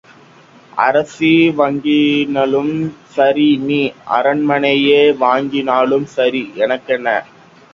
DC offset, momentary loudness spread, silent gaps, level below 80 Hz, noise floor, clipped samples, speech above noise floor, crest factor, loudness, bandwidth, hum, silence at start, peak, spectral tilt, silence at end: under 0.1%; 7 LU; none; -58 dBFS; -44 dBFS; under 0.1%; 30 dB; 14 dB; -14 LUFS; 7.6 kHz; none; 0.75 s; 0 dBFS; -6.5 dB/octave; 0.5 s